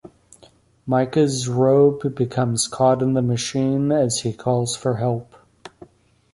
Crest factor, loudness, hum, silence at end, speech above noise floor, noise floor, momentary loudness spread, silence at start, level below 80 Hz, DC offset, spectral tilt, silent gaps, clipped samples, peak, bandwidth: 16 dB; -20 LUFS; none; 0.65 s; 34 dB; -54 dBFS; 7 LU; 0.05 s; -56 dBFS; under 0.1%; -5.5 dB/octave; none; under 0.1%; -4 dBFS; 11.5 kHz